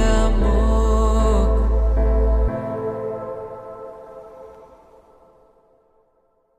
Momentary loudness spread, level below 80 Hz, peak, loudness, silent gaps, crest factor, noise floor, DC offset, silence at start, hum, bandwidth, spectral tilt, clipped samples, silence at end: 21 LU; -20 dBFS; -6 dBFS; -21 LUFS; none; 14 dB; -63 dBFS; under 0.1%; 0 s; none; 8.6 kHz; -7 dB/octave; under 0.1%; 2.05 s